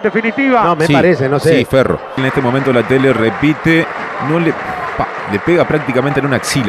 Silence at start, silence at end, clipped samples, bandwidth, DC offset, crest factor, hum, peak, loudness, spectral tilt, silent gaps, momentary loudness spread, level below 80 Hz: 0 s; 0 s; under 0.1%; 13.5 kHz; under 0.1%; 12 dB; none; 0 dBFS; -13 LUFS; -6 dB/octave; none; 7 LU; -42 dBFS